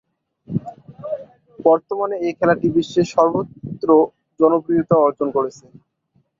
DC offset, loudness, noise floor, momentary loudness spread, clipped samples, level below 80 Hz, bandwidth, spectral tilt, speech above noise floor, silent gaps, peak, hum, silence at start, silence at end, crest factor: under 0.1%; -18 LUFS; -64 dBFS; 14 LU; under 0.1%; -58 dBFS; 7.6 kHz; -7.5 dB/octave; 47 dB; none; -2 dBFS; none; 0.5 s; 0.9 s; 18 dB